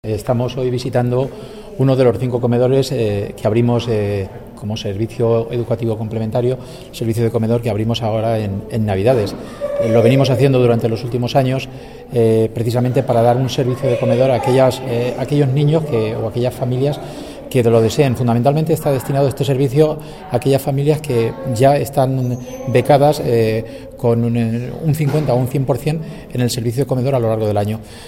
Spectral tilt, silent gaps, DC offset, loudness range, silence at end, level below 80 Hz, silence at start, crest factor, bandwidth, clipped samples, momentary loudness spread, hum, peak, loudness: -7 dB/octave; none; under 0.1%; 3 LU; 0 s; -42 dBFS; 0.05 s; 16 dB; 16 kHz; under 0.1%; 9 LU; none; 0 dBFS; -17 LUFS